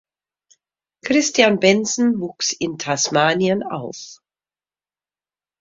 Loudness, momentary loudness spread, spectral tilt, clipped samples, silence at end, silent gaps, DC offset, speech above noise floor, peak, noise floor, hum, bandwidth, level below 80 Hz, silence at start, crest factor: -18 LUFS; 17 LU; -3.5 dB/octave; under 0.1%; 1.45 s; none; under 0.1%; over 72 dB; 0 dBFS; under -90 dBFS; 50 Hz at -50 dBFS; 7.8 kHz; -62 dBFS; 1.05 s; 20 dB